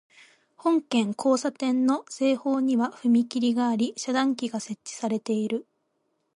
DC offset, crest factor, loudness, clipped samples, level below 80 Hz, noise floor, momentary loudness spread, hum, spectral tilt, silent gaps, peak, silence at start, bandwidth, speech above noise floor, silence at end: under 0.1%; 16 dB; -26 LUFS; under 0.1%; -76 dBFS; -74 dBFS; 7 LU; none; -4.5 dB/octave; none; -10 dBFS; 0.65 s; 11.5 kHz; 49 dB; 0.75 s